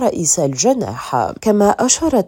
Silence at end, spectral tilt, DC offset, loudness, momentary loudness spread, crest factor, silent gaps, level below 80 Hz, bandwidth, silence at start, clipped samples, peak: 0 s; -4 dB/octave; under 0.1%; -15 LUFS; 6 LU; 14 dB; none; -46 dBFS; 17 kHz; 0 s; under 0.1%; 0 dBFS